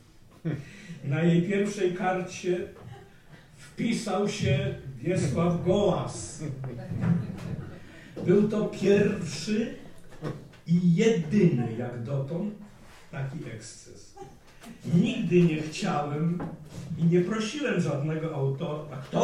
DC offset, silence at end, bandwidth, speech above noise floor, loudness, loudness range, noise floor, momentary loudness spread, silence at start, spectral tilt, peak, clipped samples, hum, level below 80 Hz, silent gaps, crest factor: under 0.1%; 0 s; 11 kHz; 25 dB; -28 LUFS; 4 LU; -51 dBFS; 18 LU; 0.45 s; -7 dB/octave; -10 dBFS; under 0.1%; none; -56 dBFS; none; 18 dB